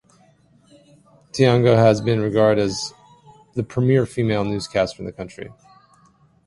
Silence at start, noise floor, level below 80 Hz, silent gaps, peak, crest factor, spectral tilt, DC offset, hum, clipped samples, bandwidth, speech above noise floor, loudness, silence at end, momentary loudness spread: 1.35 s; -56 dBFS; -50 dBFS; none; -2 dBFS; 20 dB; -6.5 dB/octave; under 0.1%; none; under 0.1%; 11.5 kHz; 37 dB; -19 LUFS; 0.95 s; 18 LU